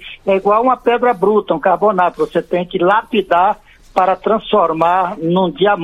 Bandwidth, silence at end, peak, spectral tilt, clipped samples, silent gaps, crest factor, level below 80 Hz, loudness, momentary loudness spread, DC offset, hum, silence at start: 12 kHz; 0 s; 0 dBFS; -7.5 dB/octave; under 0.1%; none; 14 dB; -48 dBFS; -14 LUFS; 4 LU; under 0.1%; none; 0 s